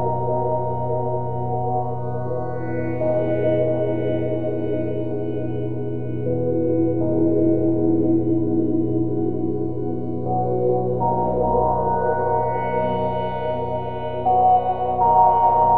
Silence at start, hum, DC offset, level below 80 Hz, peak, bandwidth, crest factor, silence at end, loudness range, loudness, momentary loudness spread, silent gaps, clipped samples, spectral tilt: 0 s; none; 3%; -44 dBFS; -4 dBFS; 3.9 kHz; 16 dB; 0 s; 3 LU; -21 LUFS; 9 LU; none; under 0.1%; -12 dB/octave